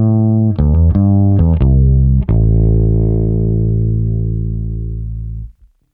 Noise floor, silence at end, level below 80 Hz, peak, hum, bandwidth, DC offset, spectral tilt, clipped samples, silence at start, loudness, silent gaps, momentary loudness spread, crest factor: -36 dBFS; 0.4 s; -18 dBFS; -2 dBFS; none; 2.8 kHz; under 0.1%; -14.5 dB/octave; under 0.1%; 0 s; -13 LUFS; none; 12 LU; 10 dB